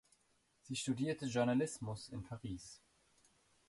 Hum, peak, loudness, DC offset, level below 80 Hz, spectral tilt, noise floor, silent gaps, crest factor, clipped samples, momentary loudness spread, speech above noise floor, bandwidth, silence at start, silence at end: none; -24 dBFS; -40 LUFS; under 0.1%; -68 dBFS; -5.5 dB/octave; -77 dBFS; none; 18 dB; under 0.1%; 13 LU; 37 dB; 11.5 kHz; 0.65 s; 0.9 s